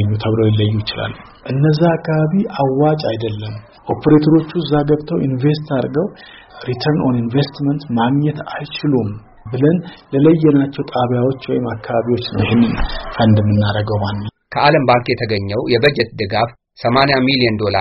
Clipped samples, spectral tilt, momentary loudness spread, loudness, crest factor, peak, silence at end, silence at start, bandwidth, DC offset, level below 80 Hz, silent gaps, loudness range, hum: under 0.1%; -5.5 dB/octave; 11 LU; -16 LUFS; 16 dB; 0 dBFS; 0 s; 0 s; 5.8 kHz; under 0.1%; -36 dBFS; none; 3 LU; none